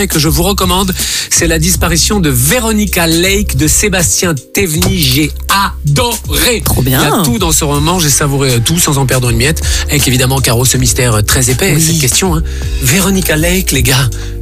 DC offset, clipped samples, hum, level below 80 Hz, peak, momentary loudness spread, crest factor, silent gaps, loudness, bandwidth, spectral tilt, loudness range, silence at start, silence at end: under 0.1%; under 0.1%; none; -20 dBFS; -2 dBFS; 3 LU; 8 dB; none; -10 LUFS; 16 kHz; -3.5 dB/octave; 1 LU; 0 s; 0 s